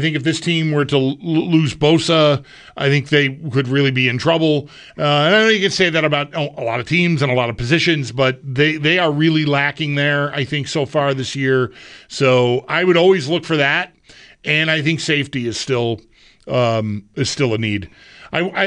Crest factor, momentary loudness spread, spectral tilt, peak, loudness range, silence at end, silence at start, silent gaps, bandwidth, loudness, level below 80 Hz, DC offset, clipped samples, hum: 14 dB; 8 LU; -5.5 dB/octave; -2 dBFS; 3 LU; 0 s; 0 s; none; 10.5 kHz; -17 LUFS; -50 dBFS; under 0.1%; under 0.1%; none